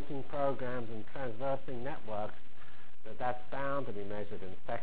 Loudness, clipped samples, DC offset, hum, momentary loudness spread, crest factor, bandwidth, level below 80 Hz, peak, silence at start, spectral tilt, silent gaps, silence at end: -40 LUFS; under 0.1%; 4%; none; 19 LU; 20 dB; 4 kHz; -62 dBFS; -20 dBFS; 0 s; -9.5 dB/octave; none; 0 s